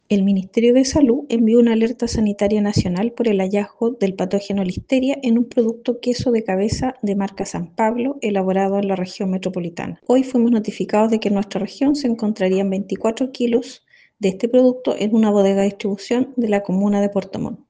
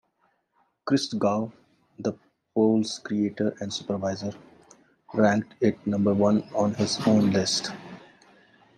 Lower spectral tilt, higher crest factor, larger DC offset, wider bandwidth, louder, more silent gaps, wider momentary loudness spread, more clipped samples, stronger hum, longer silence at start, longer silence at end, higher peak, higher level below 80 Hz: about the same, -6.5 dB/octave vs -5.5 dB/octave; about the same, 16 dB vs 20 dB; neither; about the same, 9.6 kHz vs 10 kHz; first, -19 LUFS vs -25 LUFS; neither; second, 7 LU vs 12 LU; neither; neither; second, 0.1 s vs 0.85 s; second, 0.15 s vs 0.8 s; first, -2 dBFS vs -6 dBFS; first, -48 dBFS vs -68 dBFS